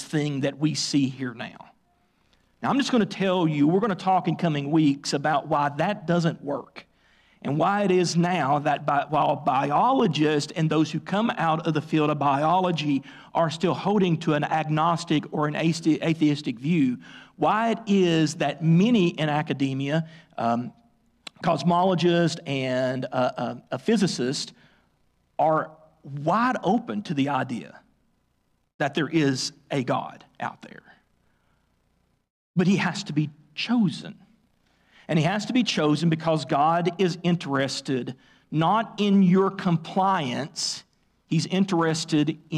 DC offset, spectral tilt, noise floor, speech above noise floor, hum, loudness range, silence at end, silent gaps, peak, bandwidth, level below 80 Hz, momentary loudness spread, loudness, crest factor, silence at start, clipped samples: under 0.1%; -6 dB/octave; -70 dBFS; 46 dB; none; 5 LU; 0 s; 28.74-28.79 s, 32.30-32.54 s; -12 dBFS; 11 kHz; -66 dBFS; 9 LU; -24 LUFS; 12 dB; 0 s; under 0.1%